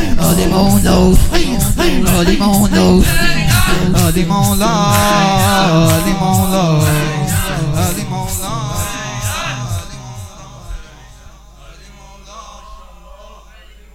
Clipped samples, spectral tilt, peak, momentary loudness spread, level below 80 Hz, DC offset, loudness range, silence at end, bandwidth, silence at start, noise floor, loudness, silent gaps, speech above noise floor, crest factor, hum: under 0.1%; -5 dB/octave; 0 dBFS; 19 LU; -22 dBFS; under 0.1%; 13 LU; 0.6 s; 17 kHz; 0 s; -39 dBFS; -13 LUFS; none; 29 dB; 12 dB; none